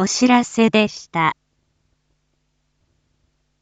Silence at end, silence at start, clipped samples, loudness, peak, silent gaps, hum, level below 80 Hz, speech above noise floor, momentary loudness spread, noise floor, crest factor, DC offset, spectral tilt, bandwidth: 2.3 s; 0 s; under 0.1%; -17 LUFS; -2 dBFS; none; none; -62 dBFS; 51 dB; 6 LU; -68 dBFS; 18 dB; under 0.1%; -4 dB/octave; 9 kHz